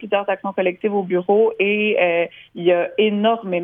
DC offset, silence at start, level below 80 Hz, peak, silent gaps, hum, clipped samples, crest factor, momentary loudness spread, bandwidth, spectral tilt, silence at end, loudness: under 0.1%; 0 s; -70 dBFS; -4 dBFS; none; none; under 0.1%; 14 dB; 6 LU; 3.7 kHz; -9 dB/octave; 0 s; -19 LUFS